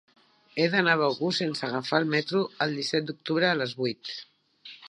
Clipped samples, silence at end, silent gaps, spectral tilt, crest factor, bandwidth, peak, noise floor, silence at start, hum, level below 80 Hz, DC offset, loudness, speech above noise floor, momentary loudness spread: under 0.1%; 0 s; none; -5 dB/octave; 22 dB; 11 kHz; -6 dBFS; -50 dBFS; 0.55 s; none; -78 dBFS; under 0.1%; -27 LUFS; 24 dB; 13 LU